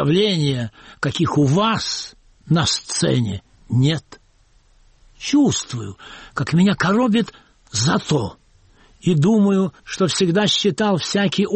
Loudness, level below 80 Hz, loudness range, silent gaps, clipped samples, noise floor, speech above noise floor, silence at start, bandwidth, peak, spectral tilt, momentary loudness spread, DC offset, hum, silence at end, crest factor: -19 LUFS; -50 dBFS; 3 LU; none; under 0.1%; -55 dBFS; 37 dB; 0 s; 8.8 kHz; -6 dBFS; -5 dB/octave; 13 LU; under 0.1%; none; 0 s; 14 dB